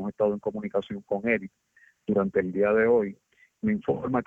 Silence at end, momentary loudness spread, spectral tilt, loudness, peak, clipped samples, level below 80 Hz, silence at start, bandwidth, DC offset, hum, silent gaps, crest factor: 0 s; 10 LU; -9 dB/octave; -27 LUFS; -10 dBFS; under 0.1%; -62 dBFS; 0 s; 3.8 kHz; under 0.1%; none; none; 16 dB